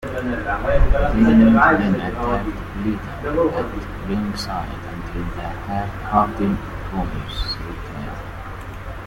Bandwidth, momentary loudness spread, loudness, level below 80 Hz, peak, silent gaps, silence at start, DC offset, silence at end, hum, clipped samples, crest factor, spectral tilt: 15.5 kHz; 17 LU; -21 LUFS; -28 dBFS; -2 dBFS; none; 0 s; under 0.1%; 0 s; none; under 0.1%; 18 dB; -7 dB/octave